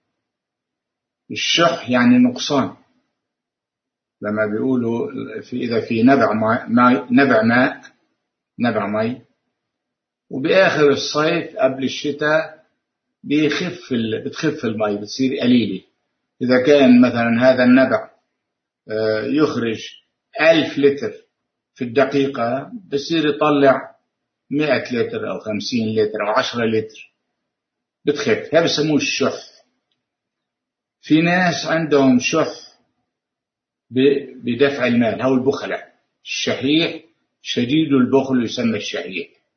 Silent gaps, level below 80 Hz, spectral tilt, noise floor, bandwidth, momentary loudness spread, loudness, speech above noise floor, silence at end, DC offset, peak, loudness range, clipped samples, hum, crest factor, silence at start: none; -62 dBFS; -5 dB/octave; -84 dBFS; 6.6 kHz; 12 LU; -18 LUFS; 67 dB; 0.3 s; under 0.1%; 0 dBFS; 5 LU; under 0.1%; none; 18 dB; 1.3 s